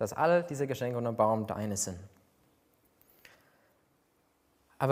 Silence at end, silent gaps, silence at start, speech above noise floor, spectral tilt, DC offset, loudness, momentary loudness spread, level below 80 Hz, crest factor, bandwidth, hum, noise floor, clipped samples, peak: 0 s; none; 0 s; 41 dB; -5 dB/octave; under 0.1%; -31 LUFS; 7 LU; -72 dBFS; 22 dB; 16 kHz; none; -72 dBFS; under 0.1%; -12 dBFS